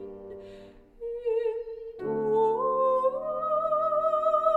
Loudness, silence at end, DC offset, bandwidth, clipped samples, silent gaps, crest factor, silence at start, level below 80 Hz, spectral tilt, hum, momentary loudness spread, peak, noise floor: -27 LUFS; 0 s; under 0.1%; 8 kHz; under 0.1%; none; 16 dB; 0 s; -60 dBFS; -7.5 dB/octave; none; 17 LU; -12 dBFS; -49 dBFS